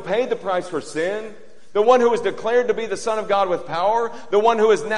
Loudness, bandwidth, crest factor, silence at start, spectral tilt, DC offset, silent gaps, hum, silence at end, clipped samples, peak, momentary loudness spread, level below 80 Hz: -20 LUFS; 11 kHz; 18 dB; 0 s; -4 dB/octave; 2%; none; none; 0 s; under 0.1%; -2 dBFS; 9 LU; -64 dBFS